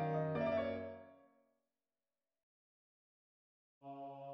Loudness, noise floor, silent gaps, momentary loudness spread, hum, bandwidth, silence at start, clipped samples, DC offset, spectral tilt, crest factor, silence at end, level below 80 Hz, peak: -41 LUFS; under -90 dBFS; 2.43-3.81 s; 18 LU; none; 5.8 kHz; 0 s; under 0.1%; under 0.1%; -6.5 dB/octave; 18 dB; 0 s; -76 dBFS; -28 dBFS